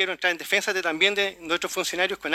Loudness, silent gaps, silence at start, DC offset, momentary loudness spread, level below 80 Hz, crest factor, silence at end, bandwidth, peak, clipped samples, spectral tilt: -24 LUFS; none; 0 s; under 0.1%; 5 LU; -64 dBFS; 20 dB; 0 s; 16.5 kHz; -6 dBFS; under 0.1%; -1.5 dB/octave